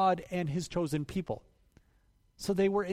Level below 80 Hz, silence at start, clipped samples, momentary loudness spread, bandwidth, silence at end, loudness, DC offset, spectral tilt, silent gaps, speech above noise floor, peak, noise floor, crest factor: -58 dBFS; 0 s; under 0.1%; 11 LU; 15.5 kHz; 0 s; -33 LUFS; under 0.1%; -6 dB/octave; none; 37 dB; -16 dBFS; -68 dBFS; 16 dB